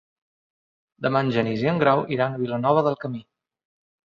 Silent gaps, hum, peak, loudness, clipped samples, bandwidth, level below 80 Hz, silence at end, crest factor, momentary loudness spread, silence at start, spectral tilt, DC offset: none; none; -4 dBFS; -23 LUFS; under 0.1%; 7.2 kHz; -64 dBFS; 0.95 s; 20 dB; 10 LU; 1 s; -8.5 dB/octave; under 0.1%